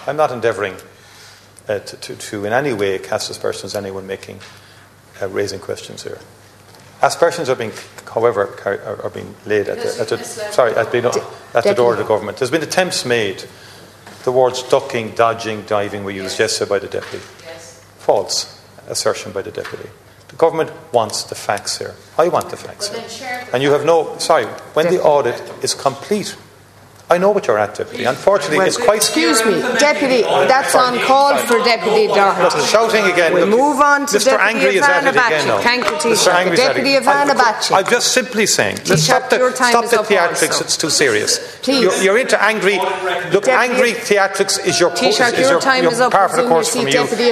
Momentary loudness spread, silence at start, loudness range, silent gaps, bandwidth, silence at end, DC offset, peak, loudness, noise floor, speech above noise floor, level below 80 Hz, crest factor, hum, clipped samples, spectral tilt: 13 LU; 0 s; 9 LU; none; 14 kHz; 0 s; under 0.1%; 0 dBFS; -15 LUFS; -44 dBFS; 28 dB; -58 dBFS; 16 dB; none; under 0.1%; -3 dB/octave